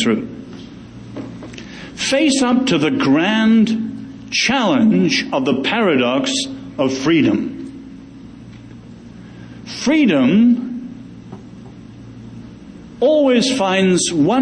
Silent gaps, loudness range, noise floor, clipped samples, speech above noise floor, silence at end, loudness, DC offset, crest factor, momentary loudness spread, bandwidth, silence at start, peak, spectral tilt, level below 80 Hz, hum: none; 5 LU; -37 dBFS; under 0.1%; 22 dB; 0 s; -15 LUFS; under 0.1%; 14 dB; 24 LU; 10 kHz; 0 s; -4 dBFS; -4.5 dB/octave; -50 dBFS; none